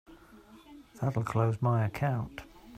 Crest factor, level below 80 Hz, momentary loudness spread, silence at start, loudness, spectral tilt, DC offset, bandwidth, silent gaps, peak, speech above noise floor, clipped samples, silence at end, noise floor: 18 dB; -58 dBFS; 10 LU; 0.1 s; -31 LUFS; -8 dB/octave; under 0.1%; 14 kHz; none; -14 dBFS; 25 dB; under 0.1%; 0 s; -55 dBFS